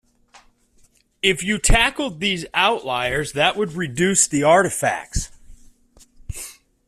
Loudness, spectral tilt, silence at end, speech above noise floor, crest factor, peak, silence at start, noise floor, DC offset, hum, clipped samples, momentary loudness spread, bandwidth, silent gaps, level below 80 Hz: -19 LUFS; -3 dB/octave; 0.35 s; 38 dB; 20 dB; -2 dBFS; 1.25 s; -57 dBFS; under 0.1%; none; under 0.1%; 17 LU; 15 kHz; none; -32 dBFS